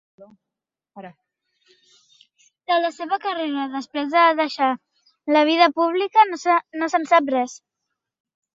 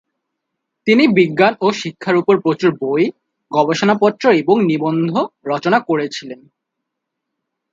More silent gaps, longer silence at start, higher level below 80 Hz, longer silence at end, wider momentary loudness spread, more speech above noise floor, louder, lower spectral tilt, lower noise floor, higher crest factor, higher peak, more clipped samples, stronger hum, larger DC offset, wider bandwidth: neither; second, 0.2 s vs 0.85 s; second, -76 dBFS vs -64 dBFS; second, 1 s vs 1.35 s; about the same, 10 LU vs 8 LU; about the same, 61 dB vs 63 dB; second, -20 LUFS vs -16 LUFS; second, -3 dB/octave vs -6 dB/octave; about the same, -81 dBFS vs -78 dBFS; about the same, 20 dB vs 16 dB; second, -4 dBFS vs 0 dBFS; neither; neither; neither; about the same, 7.8 kHz vs 7.8 kHz